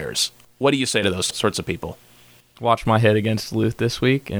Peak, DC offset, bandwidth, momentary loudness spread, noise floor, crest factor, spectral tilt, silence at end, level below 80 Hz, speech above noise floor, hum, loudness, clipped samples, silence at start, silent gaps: -2 dBFS; under 0.1%; over 20 kHz; 9 LU; -51 dBFS; 18 dB; -4.5 dB/octave; 0 s; -48 dBFS; 31 dB; none; -21 LUFS; under 0.1%; 0 s; none